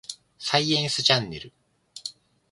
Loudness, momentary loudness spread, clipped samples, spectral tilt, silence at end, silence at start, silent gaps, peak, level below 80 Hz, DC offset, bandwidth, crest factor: -22 LUFS; 18 LU; under 0.1%; -3 dB/octave; 0.4 s; 0.1 s; none; -2 dBFS; -62 dBFS; under 0.1%; 11.5 kHz; 24 dB